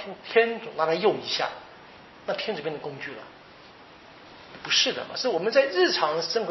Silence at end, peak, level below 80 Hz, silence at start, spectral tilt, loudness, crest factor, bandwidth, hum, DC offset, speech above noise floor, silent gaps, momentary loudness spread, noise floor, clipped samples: 0 s; -6 dBFS; -70 dBFS; 0 s; -1 dB/octave; -25 LUFS; 22 dB; 6.2 kHz; none; under 0.1%; 23 dB; none; 21 LU; -49 dBFS; under 0.1%